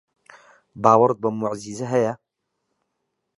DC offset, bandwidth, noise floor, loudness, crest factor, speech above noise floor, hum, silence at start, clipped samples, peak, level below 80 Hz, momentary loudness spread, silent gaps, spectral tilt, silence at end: under 0.1%; 11.5 kHz; -77 dBFS; -21 LUFS; 22 dB; 57 dB; none; 0.75 s; under 0.1%; 0 dBFS; -66 dBFS; 13 LU; none; -6.5 dB/octave; 1.2 s